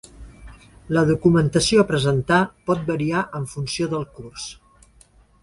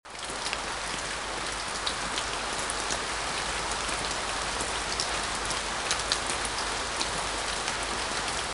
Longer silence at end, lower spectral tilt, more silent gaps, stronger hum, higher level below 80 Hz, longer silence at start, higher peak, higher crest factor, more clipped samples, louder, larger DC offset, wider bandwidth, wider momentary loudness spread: first, 0.9 s vs 0 s; first, -5.5 dB/octave vs -1 dB/octave; neither; neither; about the same, -46 dBFS vs -46 dBFS; first, 0.2 s vs 0.05 s; about the same, -4 dBFS vs -6 dBFS; second, 18 dB vs 26 dB; neither; first, -20 LUFS vs -29 LUFS; neither; about the same, 11.5 kHz vs 11.5 kHz; first, 16 LU vs 3 LU